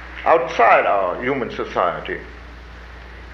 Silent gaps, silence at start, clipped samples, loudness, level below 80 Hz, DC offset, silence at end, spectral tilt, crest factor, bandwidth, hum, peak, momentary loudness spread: none; 0 s; under 0.1%; -18 LUFS; -42 dBFS; under 0.1%; 0 s; -5.5 dB/octave; 18 dB; 6.8 kHz; none; -2 dBFS; 25 LU